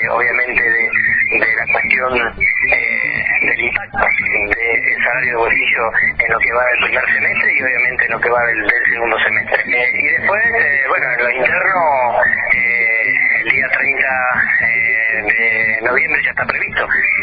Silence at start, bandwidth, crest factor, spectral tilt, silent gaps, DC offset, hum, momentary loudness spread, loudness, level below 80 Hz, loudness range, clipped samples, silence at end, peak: 0 s; 5 kHz; 14 dB; -7 dB/octave; none; under 0.1%; none; 2 LU; -13 LUFS; -44 dBFS; 1 LU; under 0.1%; 0 s; 0 dBFS